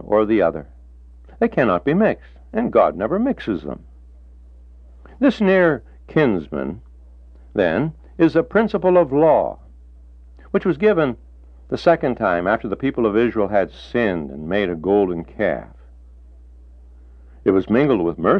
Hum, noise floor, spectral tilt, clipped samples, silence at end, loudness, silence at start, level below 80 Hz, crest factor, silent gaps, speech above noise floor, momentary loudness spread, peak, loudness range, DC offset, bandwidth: none; -43 dBFS; -8.5 dB/octave; under 0.1%; 0 s; -19 LUFS; 0 s; -44 dBFS; 18 dB; none; 25 dB; 11 LU; -2 dBFS; 4 LU; under 0.1%; 6.6 kHz